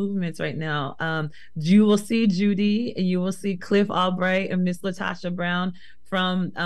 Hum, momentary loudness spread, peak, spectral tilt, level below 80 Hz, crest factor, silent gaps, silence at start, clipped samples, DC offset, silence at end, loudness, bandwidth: none; 9 LU; -8 dBFS; -6.5 dB/octave; -62 dBFS; 16 dB; none; 0 s; under 0.1%; 1%; 0 s; -24 LUFS; 12.5 kHz